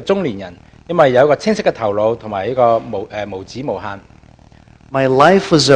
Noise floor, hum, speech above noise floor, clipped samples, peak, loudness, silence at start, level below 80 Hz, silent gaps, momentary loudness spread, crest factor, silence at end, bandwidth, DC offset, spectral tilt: -44 dBFS; none; 30 dB; 0.2%; 0 dBFS; -15 LUFS; 0 s; -48 dBFS; none; 15 LU; 16 dB; 0 s; 10 kHz; under 0.1%; -5 dB/octave